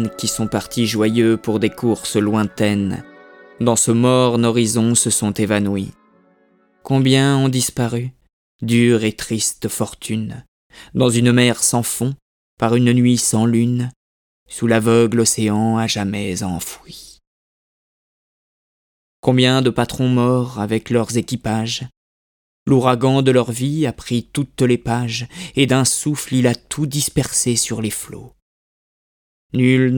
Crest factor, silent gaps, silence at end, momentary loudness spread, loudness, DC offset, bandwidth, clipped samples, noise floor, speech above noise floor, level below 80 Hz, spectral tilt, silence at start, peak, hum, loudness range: 18 dB; 8.33-8.59 s, 10.48-10.70 s, 12.22-12.57 s, 13.96-14.46 s, 17.27-19.23 s, 21.97-22.66 s, 28.42-29.50 s; 0 s; 11 LU; -17 LUFS; under 0.1%; 19 kHz; under 0.1%; -57 dBFS; 40 dB; -50 dBFS; -5 dB/octave; 0 s; 0 dBFS; none; 4 LU